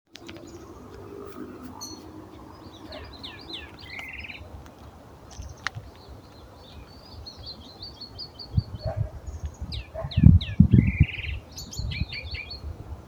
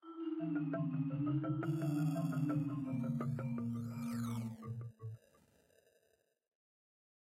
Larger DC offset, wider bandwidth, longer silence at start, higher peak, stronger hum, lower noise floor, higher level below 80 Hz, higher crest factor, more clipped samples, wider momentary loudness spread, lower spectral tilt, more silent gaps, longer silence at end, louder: neither; first, over 20 kHz vs 16 kHz; first, 0.2 s vs 0.05 s; first, 0 dBFS vs -26 dBFS; neither; second, -47 dBFS vs -78 dBFS; first, -36 dBFS vs -74 dBFS; first, 28 dB vs 14 dB; neither; first, 26 LU vs 10 LU; second, -6.5 dB/octave vs -8.5 dB/octave; neither; second, 0 s vs 2.1 s; first, -27 LUFS vs -39 LUFS